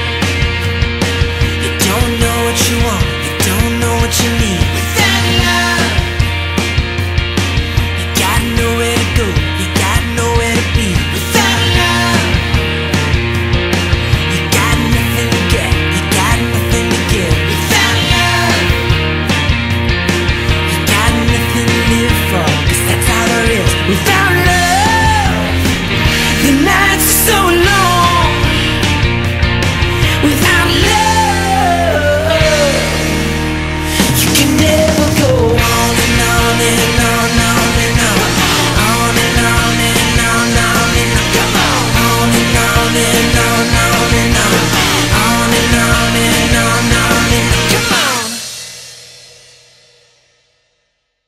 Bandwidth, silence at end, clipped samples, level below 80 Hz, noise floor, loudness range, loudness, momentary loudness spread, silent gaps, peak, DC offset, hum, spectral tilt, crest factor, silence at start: 16.5 kHz; 2.1 s; under 0.1%; -22 dBFS; -64 dBFS; 3 LU; -11 LUFS; 5 LU; none; 0 dBFS; under 0.1%; none; -4 dB/octave; 12 dB; 0 s